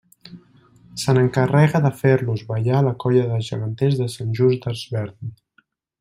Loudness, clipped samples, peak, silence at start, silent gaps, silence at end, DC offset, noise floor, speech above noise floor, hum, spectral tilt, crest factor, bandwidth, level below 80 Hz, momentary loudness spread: -20 LUFS; under 0.1%; -4 dBFS; 0.25 s; none; 0.65 s; under 0.1%; -62 dBFS; 43 dB; none; -7 dB/octave; 18 dB; 15 kHz; -56 dBFS; 11 LU